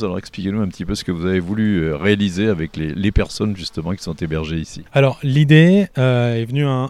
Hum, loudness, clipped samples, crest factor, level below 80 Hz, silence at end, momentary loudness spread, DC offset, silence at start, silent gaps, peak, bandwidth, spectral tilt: none; -18 LUFS; under 0.1%; 18 dB; -34 dBFS; 0 s; 12 LU; under 0.1%; 0 s; none; 0 dBFS; 12 kHz; -7 dB/octave